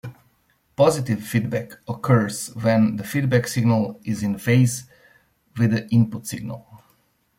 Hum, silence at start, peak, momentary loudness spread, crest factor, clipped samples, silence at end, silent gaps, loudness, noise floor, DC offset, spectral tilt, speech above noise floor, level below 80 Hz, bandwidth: none; 0.05 s; -4 dBFS; 14 LU; 18 dB; under 0.1%; 0.6 s; none; -22 LUFS; -64 dBFS; under 0.1%; -6.5 dB/octave; 43 dB; -56 dBFS; 16.5 kHz